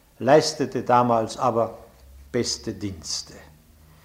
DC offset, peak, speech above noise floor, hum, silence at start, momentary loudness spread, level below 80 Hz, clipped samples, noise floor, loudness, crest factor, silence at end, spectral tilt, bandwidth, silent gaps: under 0.1%; -4 dBFS; 30 dB; none; 0.2 s; 12 LU; -52 dBFS; under 0.1%; -52 dBFS; -23 LUFS; 20 dB; 0.65 s; -4.5 dB/octave; 16 kHz; none